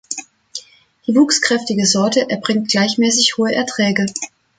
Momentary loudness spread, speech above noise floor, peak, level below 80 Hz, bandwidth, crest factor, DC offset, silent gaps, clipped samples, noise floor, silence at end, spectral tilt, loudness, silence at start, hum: 15 LU; 20 dB; 0 dBFS; -60 dBFS; 9.6 kHz; 16 dB; under 0.1%; none; under 0.1%; -35 dBFS; 0.3 s; -3 dB/octave; -15 LUFS; 0.1 s; none